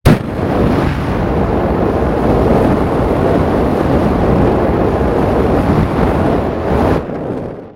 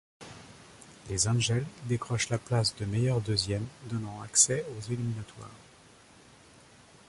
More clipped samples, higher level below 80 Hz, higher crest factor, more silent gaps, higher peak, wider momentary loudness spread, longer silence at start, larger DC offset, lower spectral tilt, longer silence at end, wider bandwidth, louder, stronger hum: neither; first, -24 dBFS vs -56 dBFS; second, 12 dB vs 24 dB; neither; first, 0 dBFS vs -8 dBFS; second, 4 LU vs 25 LU; second, 0.05 s vs 0.2 s; neither; first, -8.5 dB/octave vs -3.5 dB/octave; second, 0.05 s vs 1.45 s; first, 16.5 kHz vs 11.5 kHz; first, -14 LUFS vs -29 LUFS; neither